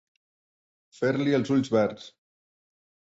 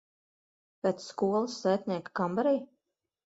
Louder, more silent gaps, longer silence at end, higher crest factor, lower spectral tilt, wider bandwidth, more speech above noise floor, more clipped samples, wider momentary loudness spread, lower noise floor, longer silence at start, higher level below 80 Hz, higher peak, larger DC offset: first, -26 LUFS vs -31 LUFS; neither; first, 1.05 s vs 0.7 s; about the same, 18 dB vs 18 dB; about the same, -7 dB/octave vs -6 dB/octave; about the same, 8 kHz vs 8 kHz; first, over 65 dB vs 55 dB; neither; about the same, 6 LU vs 4 LU; first, under -90 dBFS vs -85 dBFS; first, 1 s vs 0.85 s; first, -68 dBFS vs -76 dBFS; first, -10 dBFS vs -14 dBFS; neither